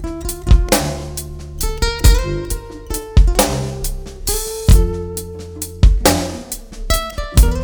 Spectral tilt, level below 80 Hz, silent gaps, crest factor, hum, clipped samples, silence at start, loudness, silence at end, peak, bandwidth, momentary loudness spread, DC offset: -4.5 dB/octave; -16 dBFS; none; 16 dB; none; under 0.1%; 0 s; -18 LUFS; 0 s; 0 dBFS; over 20 kHz; 14 LU; under 0.1%